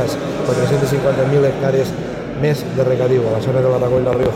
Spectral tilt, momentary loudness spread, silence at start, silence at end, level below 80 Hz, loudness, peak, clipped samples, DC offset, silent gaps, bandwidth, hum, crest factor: -7 dB/octave; 5 LU; 0 s; 0 s; -42 dBFS; -17 LUFS; -6 dBFS; under 0.1%; under 0.1%; none; 16 kHz; none; 10 dB